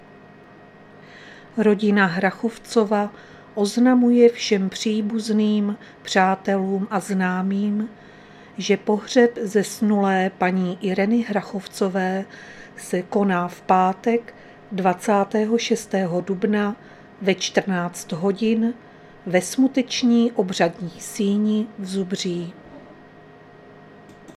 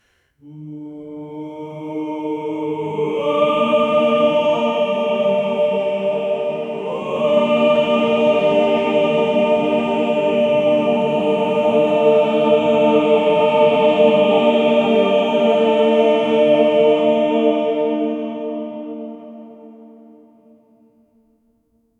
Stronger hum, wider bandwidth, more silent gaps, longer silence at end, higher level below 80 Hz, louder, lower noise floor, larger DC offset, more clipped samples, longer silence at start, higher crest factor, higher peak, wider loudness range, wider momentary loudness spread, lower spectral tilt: neither; first, 14 kHz vs 8 kHz; neither; second, 0.05 s vs 2.15 s; about the same, -64 dBFS vs -62 dBFS; second, -21 LUFS vs -16 LUFS; second, -46 dBFS vs -62 dBFS; neither; neither; first, 1.1 s vs 0.45 s; first, 20 dB vs 14 dB; about the same, -2 dBFS vs -2 dBFS; second, 4 LU vs 9 LU; about the same, 12 LU vs 14 LU; about the same, -5.5 dB/octave vs -6.5 dB/octave